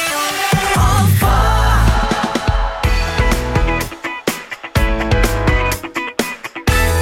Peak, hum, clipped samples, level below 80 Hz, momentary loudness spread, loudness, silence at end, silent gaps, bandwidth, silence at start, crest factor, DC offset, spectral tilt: -2 dBFS; none; under 0.1%; -18 dBFS; 8 LU; -16 LUFS; 0 s; none; 17 kHz; 0 s; 14 dB; under 0.1%; -4.5 dB/octave